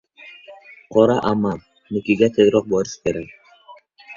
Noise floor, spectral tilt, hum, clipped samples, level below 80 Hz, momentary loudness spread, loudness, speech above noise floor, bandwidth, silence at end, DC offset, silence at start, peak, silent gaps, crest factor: -47 dBFS; -6 dB/octave; none; under 0.1%; -52 dBFS; 19 LU; -19 LUFS; 29 dB; 7.4 kHz; 0 s; under 0.1%; 0.25 s; -2 dBFS; none; 18 dB